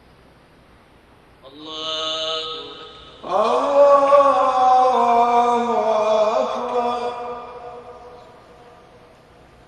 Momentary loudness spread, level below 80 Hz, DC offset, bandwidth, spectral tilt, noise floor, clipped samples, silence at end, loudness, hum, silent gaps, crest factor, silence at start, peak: 23 LU; -58 dBFS; under 0.1%; 9.6 kHz; -3.5 dB/octave; -51 dBFS; under 0.1%; 1.5 s; -17 LUFS; none; none; 18 dB; 1.45 s; -2 dBFS